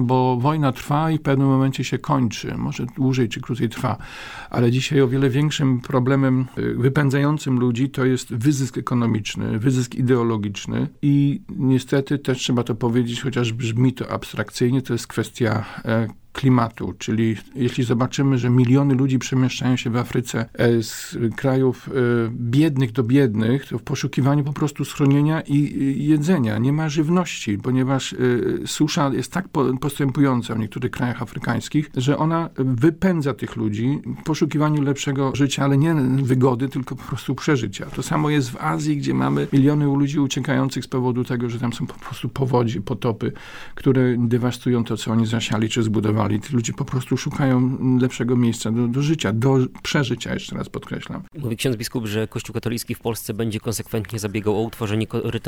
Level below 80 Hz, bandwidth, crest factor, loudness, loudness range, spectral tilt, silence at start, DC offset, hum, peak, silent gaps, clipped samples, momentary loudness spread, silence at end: -50 dBFS; 17.5 kHz; 14 dB; -21 LUFS; 3 LU; -6.5 dB/octave; 0 s; under 0.1%; none; -6 dBFS; none; under 0.1%; 8 LU; 0 s